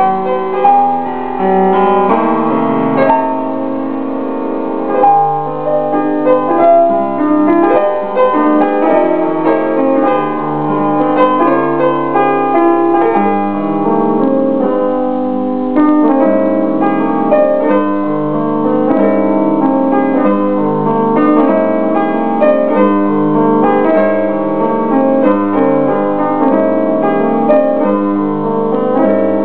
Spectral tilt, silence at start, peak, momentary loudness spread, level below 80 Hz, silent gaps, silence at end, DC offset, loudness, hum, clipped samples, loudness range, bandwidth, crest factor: -11.5 dB/octave; 0 s; 0 dBFS; 5 LU; -54 dBFS; none; 0 s; 4%; -12 LUFS; none; under 0.1%; 2 LU; 4 kHz; 12 dB